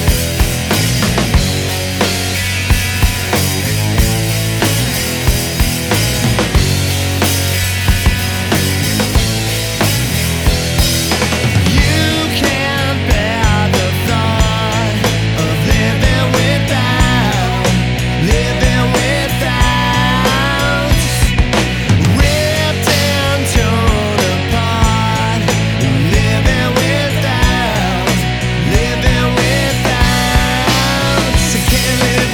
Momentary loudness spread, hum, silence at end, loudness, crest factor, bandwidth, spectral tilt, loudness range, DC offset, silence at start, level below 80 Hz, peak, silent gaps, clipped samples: 3 LU; none; 0 s; -13 LUFS; 12 dB; over 20 kHz; -4.5 dB/octave; 1 LU; under 0.1%; 0 s; -20 dBFS; 0 dBFS; none; under 0.1%